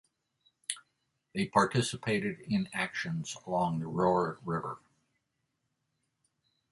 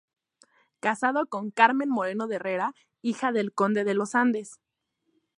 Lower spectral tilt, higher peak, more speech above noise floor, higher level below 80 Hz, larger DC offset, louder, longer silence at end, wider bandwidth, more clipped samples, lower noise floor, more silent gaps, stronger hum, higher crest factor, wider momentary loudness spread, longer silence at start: about the same, -5 dB/octave vs -5 dB/octave; second, -10 dBFS vs -4 dBFS; about the same, 50 dB vs 51 dB; first, -66 dBFS vs -82 dBFS; neither; second, -32 LUFS vs -26 LUFS; first, 1.95 s vs 0.85 s; about the same, 11.5 kHz vs 11 kHz; neither; first, -82 dBFS vs -77 dBFS; neither; neither; about the same, 26 dB vs 22 dB; about the same, 13 LU vs 11 LU; second, 0.7 s vs 0.85 s